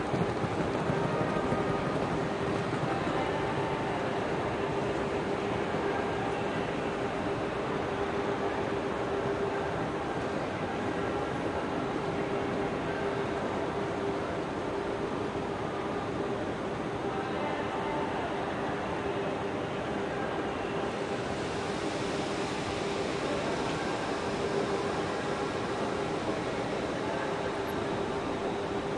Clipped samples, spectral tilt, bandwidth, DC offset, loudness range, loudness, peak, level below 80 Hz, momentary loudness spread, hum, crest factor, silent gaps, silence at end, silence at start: under 0.1%; -6 dB/octave; 12 kHz; under 0.1%; 2 LU; -32 LUFS; -16 dBFS; -54 dBFS; 3 LU; none; 16 dB; none; 0 s; 0 s